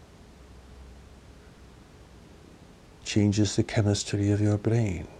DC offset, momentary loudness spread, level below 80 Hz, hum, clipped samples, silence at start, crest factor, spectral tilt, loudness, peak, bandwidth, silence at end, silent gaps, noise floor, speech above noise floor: under 0.1%; 3 LU; -50 dBFS; none; under 0.1%; 0.4 s; 18 dB; -6 dB/octave; -26 LUFS; -10 dBFS; 10 kHz; 0 s; none; -51 dBFS; 26 dB